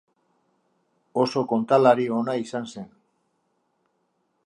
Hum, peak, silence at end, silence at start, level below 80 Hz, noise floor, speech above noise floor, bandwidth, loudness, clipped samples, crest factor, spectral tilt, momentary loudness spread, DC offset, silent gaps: none; -4 dBFS; 1.6 s; 1.15 s; -76 dBFS; -72 dBFS; 50 dB; 11 kHz; -23 LUFS; under 0.1%; 22 dB; -6.5 dB/octave; 19 LU; under 0.1%; none